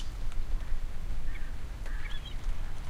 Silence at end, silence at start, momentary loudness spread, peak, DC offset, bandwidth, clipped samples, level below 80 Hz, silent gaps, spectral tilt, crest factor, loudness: 0 s; 0 s; 3 LU; -18 dBFS; under 0.1%; 8 kHz; under 0.1%; -32 dBFS; none; -5 dB/octave; 12 dB; -41 LUFS